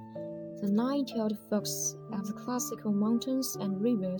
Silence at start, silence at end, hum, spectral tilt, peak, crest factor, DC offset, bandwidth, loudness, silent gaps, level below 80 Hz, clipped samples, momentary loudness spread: 0 s; 0 s; none; -5 dB/octave; -18 dBFS; 14 dB; under 0.1%; over 20 kHz; -32 LUFS; none; -72 dBFS; under 0.1%; 9 LU